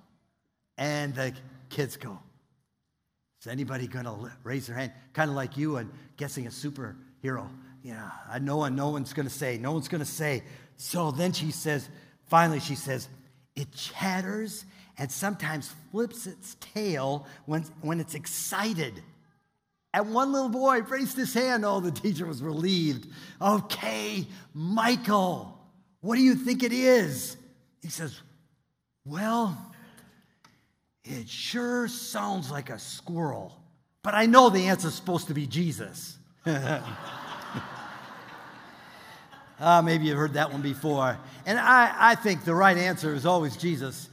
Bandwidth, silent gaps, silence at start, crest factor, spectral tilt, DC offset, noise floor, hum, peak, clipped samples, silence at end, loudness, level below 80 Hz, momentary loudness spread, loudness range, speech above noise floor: 16 kHz; none; 0.8 s; 28 dB; -5 dB/octave; under 0.1%; -80 dBFS; none; -2 dBFS; under 0.1%; 0.05 s; -27 LUFS; -70 dBFS; 20 LU; 12 LU; 52 dB